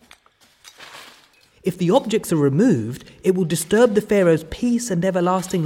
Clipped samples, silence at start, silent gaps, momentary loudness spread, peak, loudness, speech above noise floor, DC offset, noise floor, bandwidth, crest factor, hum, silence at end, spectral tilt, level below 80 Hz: under 0.1%; 0.8 s; none; 12 LU; -2 dBFS; -19 LUFS; 38 dB; under 0.1%; -57 dBFS; 17 kHz; 18 dB; none; 0 s; -6 dB/octave; -52 dBFS